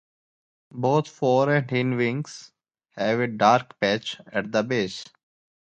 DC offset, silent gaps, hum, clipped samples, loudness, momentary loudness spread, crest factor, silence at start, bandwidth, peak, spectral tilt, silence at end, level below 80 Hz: under 0.1%; none; none; under 0.1%; -24 LUFS; 12 LU; 22 dB; 0.75 s; 9 kHz; -4 dBFS; -6 dB/octave; 0.65 s; -66 dBFS